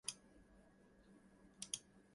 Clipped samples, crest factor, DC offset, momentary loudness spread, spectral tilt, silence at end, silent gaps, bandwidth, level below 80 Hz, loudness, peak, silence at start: under 0.1%; 32 dB; under 0.1%; 21 LU; -0.5 dB/octave; 0 s; none; 11.5 kHz; -76 dBFS; -50 LUFS; -24 dBFS; 0.05 s